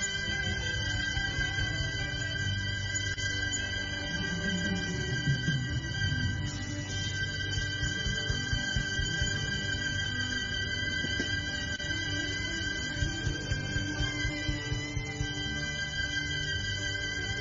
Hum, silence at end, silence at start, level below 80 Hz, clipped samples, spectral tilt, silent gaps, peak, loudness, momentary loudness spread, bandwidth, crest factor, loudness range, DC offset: none; 0 s; 0 s; -42 dBFS; under 0.1%; -3 dB/octave; none; -16 dBFS; -32 LUFS; 3 LU; 7.4 kHz; 16 dB; 2 LU; under 0.1%